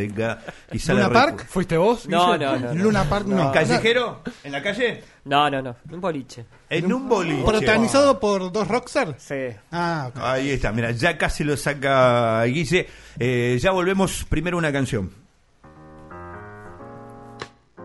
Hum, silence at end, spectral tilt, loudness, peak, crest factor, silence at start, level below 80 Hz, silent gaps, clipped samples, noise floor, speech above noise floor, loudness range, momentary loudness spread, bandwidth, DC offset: none; 0 s; -5.5 dB/octave; -21 LUFS; -2 dBFS; 20 dB; 0 s; -40 dBFS; none; under 0.1%; -52 dBFS; 31 dB; 4 LU; 21 LU; 11.5 kHz; under 0.1%